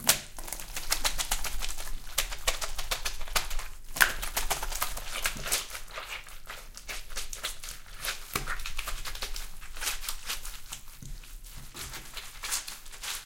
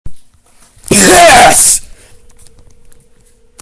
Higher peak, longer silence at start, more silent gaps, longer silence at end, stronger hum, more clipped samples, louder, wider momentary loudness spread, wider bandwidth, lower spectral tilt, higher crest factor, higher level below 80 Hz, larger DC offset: second, -4 dBFS vs 0 dBFS; about the same, 0 s vs 0.05 s; neither; second, 0 s vs 1.75 s; neither; second, under 0.1% vs 2%; second, -33 LUFS vs -4 LUFS; first, 14 LU vs 8 LU; first, 17 kHz vs 11 kHz; second, 0 dB/octave vs -2 dB/octave; first, 30 dB vs 10 dB; second, -38 dBFS vs -32 dBFS; neither